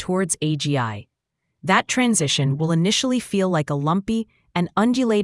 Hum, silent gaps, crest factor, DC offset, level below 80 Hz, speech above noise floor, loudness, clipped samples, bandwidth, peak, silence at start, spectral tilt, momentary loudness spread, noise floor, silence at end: none; none; 20 dB; under 0.1%; -56 dBFS; 57 dB; -21 LUFS; under 0.1%; 12 kHz; -2 dBFS; 0 s; -4.5 dB/octave; 8 LU; -78 dBFS; 0 s